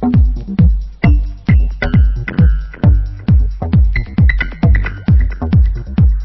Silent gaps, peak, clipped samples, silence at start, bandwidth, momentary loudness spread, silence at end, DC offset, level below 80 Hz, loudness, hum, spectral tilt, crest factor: none; 0 dBFS; under 0.1%; 0 s; 5.6 kHz; 2 LU; 0 s; under 0.1%; -14 dBFS; -14 LUFS; none; -10 dB/octave; 12 dB